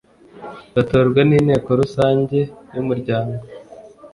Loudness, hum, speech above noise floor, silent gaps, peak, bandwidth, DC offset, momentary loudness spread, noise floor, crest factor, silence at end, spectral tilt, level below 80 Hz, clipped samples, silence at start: -18 LUFS; none; 24 dB; none; -2 dBFS; 11 kHz; under 0.1%; 22 LU; -41 dBFS; 16 dB; 0.05 s; -8.5 dB/octave; -46 dBFS; under 0.1%; 0.35 s